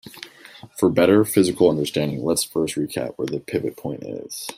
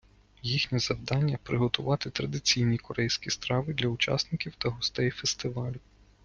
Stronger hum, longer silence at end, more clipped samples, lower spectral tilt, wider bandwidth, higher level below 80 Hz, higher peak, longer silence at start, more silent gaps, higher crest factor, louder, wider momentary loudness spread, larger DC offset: neither; second, 0.05 s vs 0.45 s; neither; about the same, -5 dB/octave vs -4.5 dB/octave; first, 16 kHz vs 9.8 kHz; about the same, -58 dBFS vs -54 dBFS; first, -2 dBFS vs -8 dBFS; second, 0.05 s vs 0.45 s; neither; about the same, 20 dB vs 22 dB; first, -21 LUFS vs -29 LUFS; first, 16 LU vs 6 LU; neither